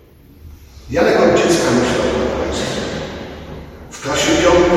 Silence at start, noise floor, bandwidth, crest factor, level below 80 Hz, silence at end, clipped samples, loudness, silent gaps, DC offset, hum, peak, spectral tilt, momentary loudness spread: 0.45 s; -41 dBFS; 15 kHz; 16 dB; -34 dBFS; 0 s; under 0.1%; -15 LUFS; none; under 0.1%; none; 0 dBFS; -4.5 dB/octave; 19 LU